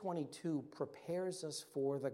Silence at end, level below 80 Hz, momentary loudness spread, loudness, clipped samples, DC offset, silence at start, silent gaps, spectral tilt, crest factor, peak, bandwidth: 0 s; -88 dBFS; 5 LU; -43 LUFS; under 0.1%; under 0.1%; 0 s; none; -5.5 dB/octave; 16 dB; -26 dBFS; 16.5 kHz